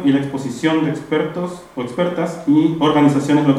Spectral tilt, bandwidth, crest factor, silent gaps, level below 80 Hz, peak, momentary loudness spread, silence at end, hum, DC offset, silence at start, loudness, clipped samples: -7 dB/octave; 11.5 kHz; 16 dB; none; -56 dBFS; -2 dBFS; 12 LU; 0 s; none; under 0.1%; 0 s; -18 LUFS; under 0.1%